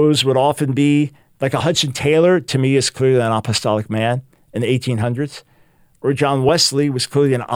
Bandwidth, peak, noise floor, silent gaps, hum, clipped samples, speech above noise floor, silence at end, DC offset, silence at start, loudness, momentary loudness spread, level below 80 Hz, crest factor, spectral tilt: 16.5 kHz; -2 dBFS; -53 dBFS; none; none; under 0.1%; 37 dB; 0 s; under 0.1%; 0 s; -17 LUFS; 10 LU; -54 dBFS; 14 dB; -5 dB/octave